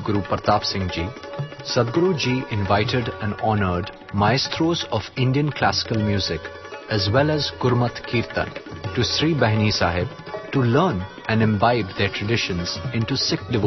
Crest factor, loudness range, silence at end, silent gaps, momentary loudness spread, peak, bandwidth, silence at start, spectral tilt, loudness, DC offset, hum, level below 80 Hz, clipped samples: 20 dB; 2 LU; 0 s; none; 9 LU; -2 dBFS; 6.2 kHz; 0 s; -5.5 dB/octave; -22 LUFS; under 0.1%; none; -46 dBFS; under 0.1%